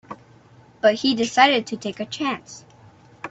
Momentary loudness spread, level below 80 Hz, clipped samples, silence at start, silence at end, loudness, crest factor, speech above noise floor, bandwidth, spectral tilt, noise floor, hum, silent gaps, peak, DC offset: 25 LU; -64 dBFS; under 0.1%; 0.1 s; 0 s; -20 LUFS; 22 dB; 30 dB; 8.2 kHz; -3.5 dB/octave; -51 dBFS; none; none; -2 dBFS; under 0.1%